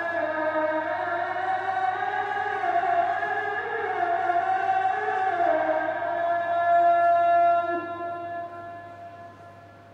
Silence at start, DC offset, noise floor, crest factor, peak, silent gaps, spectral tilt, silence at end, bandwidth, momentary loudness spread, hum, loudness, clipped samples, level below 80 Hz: 0 s; under 0.1%; -47 dBFS; 12 dB; -12 dBFS; none; -5.5 dB/octave; 0 s; 6.6 kHz; 15 LU; none; -25 LUFS; under 0.1%; -72 dBFS